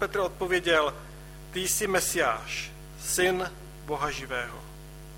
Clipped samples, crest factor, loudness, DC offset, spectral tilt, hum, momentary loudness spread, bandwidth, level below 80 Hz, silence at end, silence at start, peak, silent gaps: under 0.1%; 20 dB; -28 LUFS; under 0.1%; -2.5 dB/octave; none; 19 LU; 16.5 kHz; -48 dBFS; 0 s; 0 s; -10 dBFS; none